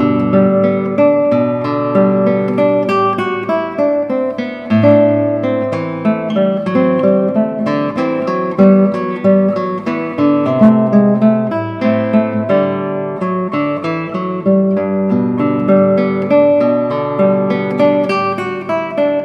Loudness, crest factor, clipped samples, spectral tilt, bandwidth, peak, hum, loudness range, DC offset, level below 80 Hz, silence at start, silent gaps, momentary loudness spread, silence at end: -14 LUFS; 12 dB; under 0.1%; -9 dB/octave; 6.2 kHz; 0 dBFS; none; 3 LU; under 0.1%; -58 dBFS; 0 s; none; 8 LU; 0 s